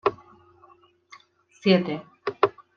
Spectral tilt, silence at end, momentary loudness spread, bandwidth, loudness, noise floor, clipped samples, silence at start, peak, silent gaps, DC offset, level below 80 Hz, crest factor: -7.5 dB/octave; 0.25 s; 11 LU; 6.8 kHz; -25 LUFS; -57 dBFS; under 0.1%; 0.05 s; -6 dBFS; none; under 0.1%; -70 dBFS; 22 dB